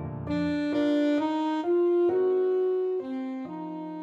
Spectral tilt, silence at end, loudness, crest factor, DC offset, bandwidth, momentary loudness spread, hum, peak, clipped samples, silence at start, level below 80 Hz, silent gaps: -7.5 dB/octave; 0 s; -27 LUFS; 10 dB; under 0.1%; 7.6 kHz; 11 LU; none; -16 dBFS; under 0.1%; 0 s; -58 dBFS; none